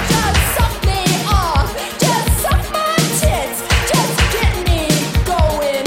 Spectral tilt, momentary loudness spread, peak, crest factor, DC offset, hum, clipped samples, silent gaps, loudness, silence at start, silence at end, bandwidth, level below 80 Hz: -4 dB/octave; 3 LU; 0 dBFS; 14 dB; under 0.1%; none; under 0.1%; none; -15 LUFS; 0 s; 0 s; 16.5 kHz; -20 dBFS